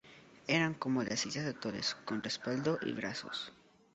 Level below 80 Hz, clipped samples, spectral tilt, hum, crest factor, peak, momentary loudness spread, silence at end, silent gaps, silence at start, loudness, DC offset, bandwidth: -72 dBFS; under 0.1%; -3.5 dB/octave; none; 22 dB; -16 dBFS; 9 LU; 0.4 s; none; 0.05 s; -36 LUFS; under 0.1%; 8 kHz